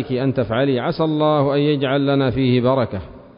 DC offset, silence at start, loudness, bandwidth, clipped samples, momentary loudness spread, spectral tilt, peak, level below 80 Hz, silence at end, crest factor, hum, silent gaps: under 0.1%; 0 s; -18 LUFS; 5.4 kHz; under 0.1%; 4 LU; -12.5 dB/octave; -6 dBFS; -44 dBFS; 0.15 s; 12 dB; none; none